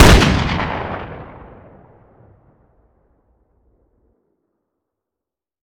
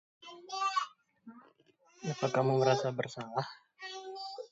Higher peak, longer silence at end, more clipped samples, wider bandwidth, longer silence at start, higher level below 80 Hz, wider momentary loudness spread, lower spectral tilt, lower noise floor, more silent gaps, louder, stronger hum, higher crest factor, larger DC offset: first, 0 dBFS vs -14 dBFS; first, 4.35 s vs 0.05 s; neither; first, 17 kHz vs 8 kHz; second, 0 s vs 0.2 s; first, -24 dBFS vs -78 dBFS; first, 28 LU vs 16 LU; about the same, -5 dB/octave vs -5.5 dB/octave; first, -86 dBFS vs -67 dBFS; neither; first, -16 LUFS vs -34 LUFS; neither; about the same, 20 dB vs 22 dB; neither